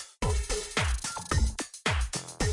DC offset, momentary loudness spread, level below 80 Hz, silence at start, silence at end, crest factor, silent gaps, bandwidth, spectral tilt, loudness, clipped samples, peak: under 0.1%; 3 LU; -34 dBFS; 0 s; 0 s; 18 dB; none; 11.5 kHz; -3.5 dB/octave; -31 LUFS; under 0.1%; -12 dBFS